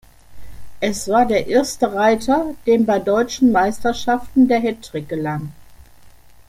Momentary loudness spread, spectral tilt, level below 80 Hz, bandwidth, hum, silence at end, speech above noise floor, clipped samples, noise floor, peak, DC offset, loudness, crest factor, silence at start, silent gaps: 9 LU; -5 dB/octave; -46 dBFS; 16 kHz; none; 0.4 s; 26 dB; under 0.1%; -44 dBFS; -2 dBFS; under 0.1%; -18 LUFS; 16 dB; 0.3 s; none